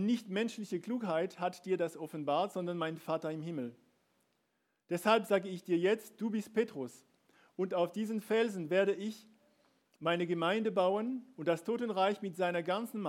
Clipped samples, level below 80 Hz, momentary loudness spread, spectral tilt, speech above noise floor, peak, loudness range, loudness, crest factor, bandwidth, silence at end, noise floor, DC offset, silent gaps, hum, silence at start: under 0.1%; under -90 dBFS; 9 LU; -6 dB/octave; 46 dB; -14 dBFS; 3 LU; -35 LUFS; 22 dB; 16.5 kHz; 0 s; -80 dBFS; under 0.1%; none; none; 0 s